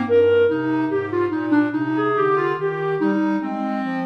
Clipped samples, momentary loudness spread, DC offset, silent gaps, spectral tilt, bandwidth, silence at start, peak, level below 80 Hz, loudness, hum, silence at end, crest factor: under 0.1%; 7 LU; under 0.1%; none; -8.5 dB/octave; 6 kHz; 0 s; -8 dBFS; -70 dBFS; -20 LUFS; none; 0 s; 12 dB